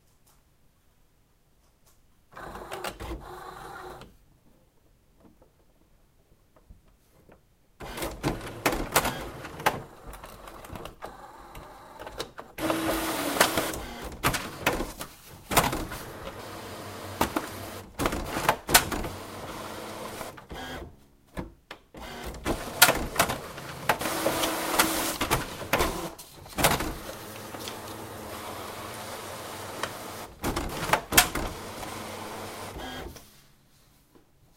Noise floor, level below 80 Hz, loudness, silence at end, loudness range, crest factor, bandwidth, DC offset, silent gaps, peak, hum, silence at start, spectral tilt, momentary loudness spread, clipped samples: -64 dBFS; -46 dBFS; -29 LUFS; 1.2 s; 15 LU; 32 dB; 16.5 kHz; under 0.1%; none; 0 dBFS; none; 2.35 s; -2.5 dB/octave; 20 LU; under 0.1%